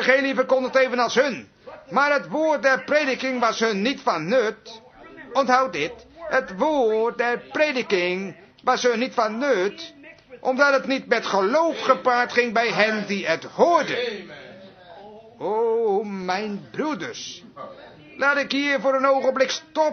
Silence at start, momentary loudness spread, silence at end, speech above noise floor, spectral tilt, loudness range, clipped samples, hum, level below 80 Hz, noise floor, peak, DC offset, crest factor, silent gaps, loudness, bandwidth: 0 s; 11 LU; 0 s; 22 dB; -4 dB/octave; 5 LU; under 0.1%; none; -66 dBFS; -44 dBFS; -2 dBFS; under 0.1%; 20 dB; none; -22 LUFS; 6.6 kHz